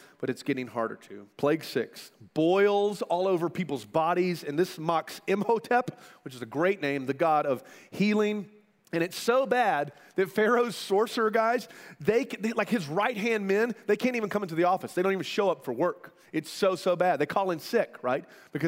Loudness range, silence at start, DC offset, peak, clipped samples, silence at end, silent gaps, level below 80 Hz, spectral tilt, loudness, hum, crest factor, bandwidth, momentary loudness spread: 2 LU; 0.2 s; under 0.1%; -10 dBFS; under 0.1%; 0 s; none; -76 dBFS; -5.5 dB/octave; -28 LUFS; none; 18 dB; 16 kHz; 10 LU